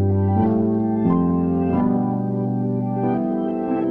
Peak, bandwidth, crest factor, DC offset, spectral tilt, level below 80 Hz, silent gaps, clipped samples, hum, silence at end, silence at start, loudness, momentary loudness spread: -6 dBFS; 3.5 kHz; 12 dB; under 0.1%; -12.5 dB/octave; -48 dBFS; none; under 0.1%; none; 0 s; 0 s; -21 LUFS; 4 LU